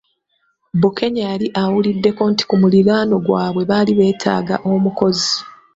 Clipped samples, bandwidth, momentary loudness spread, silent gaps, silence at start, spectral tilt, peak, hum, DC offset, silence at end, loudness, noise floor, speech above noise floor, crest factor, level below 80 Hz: under 0.1%; 7.8 kHz; 6 LU; none; 0.75 s; -6 dB/octave; -2 dBFS; none; under 0.1%; 0.25 s; -16 LUFS; -65 dBFS; 50 dB; 14 dB; -54 dBFS